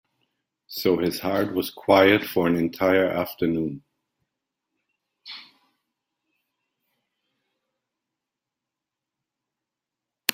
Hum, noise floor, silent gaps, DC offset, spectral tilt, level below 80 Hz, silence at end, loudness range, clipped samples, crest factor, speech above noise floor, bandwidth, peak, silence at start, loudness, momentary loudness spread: none; -87 dBFS; none; under 0.1%; -5 dB/octave; -64 dBFS; 0 s; 12 LU; under 0.1%; 26 dB; 65 dB; 16.5 kHz; 0 dBFS; 0.7 s; -22 LUFS; 22 LU